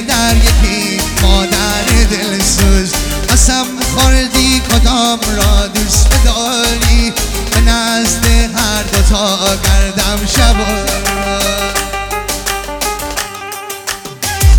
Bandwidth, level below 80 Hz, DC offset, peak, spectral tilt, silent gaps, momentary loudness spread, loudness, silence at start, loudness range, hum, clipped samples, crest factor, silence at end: over 20 kHz; -14 dBFS; under 0.1%; 0 dBFS; -3.5 dB/octave; none; 8 LU; -12 LUFS; 0 s; 4 LU; none; under 0.1%; 10 dB; 0 s